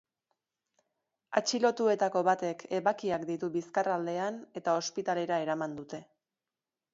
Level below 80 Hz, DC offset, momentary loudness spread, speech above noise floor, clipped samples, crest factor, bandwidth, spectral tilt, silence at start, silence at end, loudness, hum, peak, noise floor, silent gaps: -78 dBFS; under 0.1%; 9 LU; over 59 dB; under 0.1%; 22 dB; 7.8 kHz; -4 dB/octave; 1.3 s; 0.9 s; -31 LUFS; none; -12 dBFS; under -90 dBFS; none